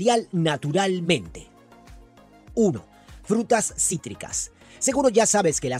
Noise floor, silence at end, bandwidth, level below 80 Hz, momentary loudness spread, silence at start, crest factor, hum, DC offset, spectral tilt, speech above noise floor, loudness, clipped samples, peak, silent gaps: -50 dBFS; 0 s; 15.5 kHz; -52 dBFS; 12 LU; 0 s; 18 dB; none; under 0.1%; -4 dB/octave; 28 dB; -23 LUFS; under 0.1%; -6 dBFS; none